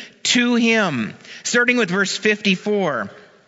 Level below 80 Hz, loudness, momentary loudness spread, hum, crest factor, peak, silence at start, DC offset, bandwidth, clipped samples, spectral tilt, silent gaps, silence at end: -70 dBFS; -18 LUFS; 11 LU; none; 18 dB; 0 dBFS; 0 s; under 0.1%; 8 kHz; under 0.1%; -3.5 dB/octave; none; 0.3 s